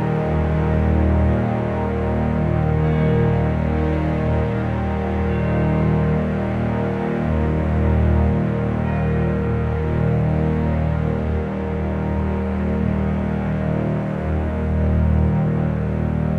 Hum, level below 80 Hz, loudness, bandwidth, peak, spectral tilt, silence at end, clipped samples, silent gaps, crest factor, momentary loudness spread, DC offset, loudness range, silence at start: none; -26 dBFS; -20 LUFS; 4.7 kHz; -6 dBFS; -10 dB/octave; 0 s; under 0.1%; none; 12 dB; 4 LU; under 0.1%; 2 LU; 0 s